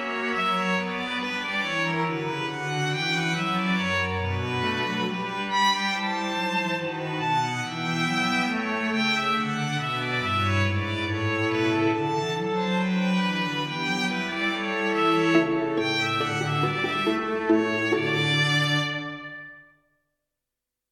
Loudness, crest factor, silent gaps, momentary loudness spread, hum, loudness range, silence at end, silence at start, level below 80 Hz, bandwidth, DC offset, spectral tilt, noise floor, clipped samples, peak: -25 LUFS; 18 dB; none; 6 LU; none; 2 LU; 1.3 s; 0 s; -62 dBFS; 15 kHz; under 0.1%; -5 dB/octave; -86 dBFS; under 0.1%; -8 dBFS